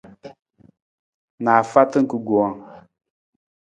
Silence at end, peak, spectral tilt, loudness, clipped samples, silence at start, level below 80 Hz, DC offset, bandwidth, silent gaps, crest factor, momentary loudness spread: 0.85 s; 0 dBFS; -7 dB/octave; -19 LUFS; under 0.1%; 0.25 s; -66 dBFS; under 0.1%; 9.4 kHz; 0.82-1.38 s; 22 dB; 10 LU